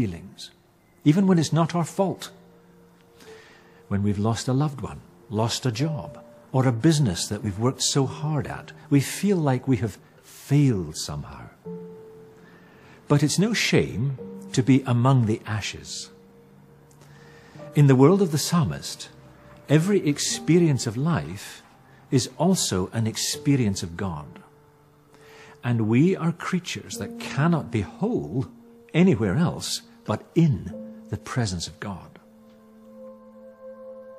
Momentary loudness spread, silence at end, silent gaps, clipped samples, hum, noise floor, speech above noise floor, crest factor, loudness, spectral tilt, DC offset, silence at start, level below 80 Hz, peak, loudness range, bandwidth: 19 LU; 0 s; none; under 0.1%; none; -55 dBFS; 33 dB; 22 dB; -24 LUFS; -5.5 dB/octave; under 0.1%; 0 s; -56 dBFS; -2 dBFS; 5 LU; 15 kHz